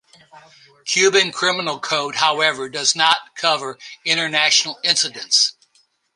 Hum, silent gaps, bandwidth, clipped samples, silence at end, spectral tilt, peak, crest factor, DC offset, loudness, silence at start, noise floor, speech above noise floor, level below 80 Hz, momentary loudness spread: none; none; 11.5 kHz; under 0.1%; 0.65 s; -0.5 dB/octave; 0 dBFS; 20 dB; under 0.1%; -17 LUFS; 0.35 s; -61 dBFS; 42 dB; -72 dBFS; 7 LU